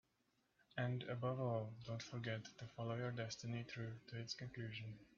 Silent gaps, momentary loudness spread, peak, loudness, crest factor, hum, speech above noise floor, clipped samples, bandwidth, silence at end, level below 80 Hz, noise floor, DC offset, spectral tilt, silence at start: none; 7 LU; -30 dBFS; -47 LUFS; 18 dB; none; 36 dB; under 0.1%; 7.2 kHz; 0.1 s; -78 dBFS; -83 dBFS; under 0.1%; -5 dB/octave; 0.75 s